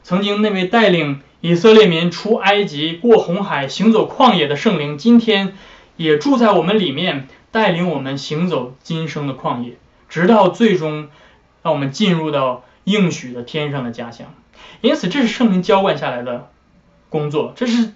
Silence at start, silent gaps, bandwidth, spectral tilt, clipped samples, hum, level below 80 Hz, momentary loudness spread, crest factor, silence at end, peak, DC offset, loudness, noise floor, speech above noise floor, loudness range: 0.05 s; none; 7.8 kHz; -6 dB/octave; under 0.1%; none; -56 dBFS; 13 LU; 16 dB; 0.05 s; 0 dBFS; under 0.1%; -16 LUFS; -52 dBFS; 37 dB; 6 LU